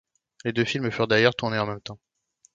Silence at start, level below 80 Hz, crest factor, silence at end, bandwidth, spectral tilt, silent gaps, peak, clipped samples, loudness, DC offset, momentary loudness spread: 0.45 s; -60 dBFS; 22 dB; 0.6 s; 7.8 kHz; -5.5 dB/octave; none; -4 dBFS; under 0.1%; -24 LUFS; under 0.1%; 14 LU